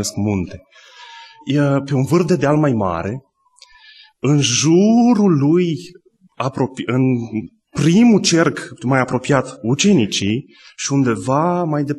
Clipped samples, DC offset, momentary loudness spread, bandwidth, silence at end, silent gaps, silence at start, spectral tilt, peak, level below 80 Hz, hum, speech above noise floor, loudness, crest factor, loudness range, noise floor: under 0.1%; under 0.1%; 13 LU; 12.5 kHz; 0 s; none; 0 s; -5.5 dB/octave; -2 dBFS; -52 dBFS; none; 33 dB; -16 LUFS; 16 dB; 3 LU; -49 dBFS